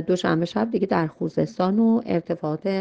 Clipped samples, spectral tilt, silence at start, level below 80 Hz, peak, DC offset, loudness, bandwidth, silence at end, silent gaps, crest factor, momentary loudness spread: under 0.1%; -7.5 dB/octave; 0 s; -60 dBFS; -6 dBFS; under 0.1%; -23 LUFS; 7.8 kHz; 0 s; none; 16 dB; 6 LU